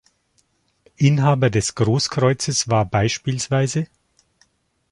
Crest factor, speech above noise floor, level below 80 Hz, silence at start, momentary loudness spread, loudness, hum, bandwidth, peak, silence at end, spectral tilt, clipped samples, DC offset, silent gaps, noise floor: 18 dB; 46 dB; -48 dBFS; 1 s; 6 LU; -19 LUFS; none; 11.5 kHz; -4 dBFS; 1.05 s; -5 dB/octave; under 0.1%; under 0.1%; none; -65 dBFS